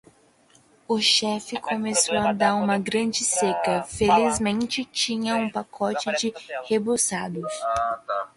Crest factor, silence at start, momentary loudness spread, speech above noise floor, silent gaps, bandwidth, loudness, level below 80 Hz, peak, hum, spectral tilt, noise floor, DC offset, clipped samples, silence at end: 18 dB; 0.9 s; 9 LU; 34 dB; none; 11.5 kHz; -23 LUFS; -54 dBFS; -8 dBFS; none; -3 dB/octave; -58 dBFS; under 0.1%; under 0.1%; 0.1 s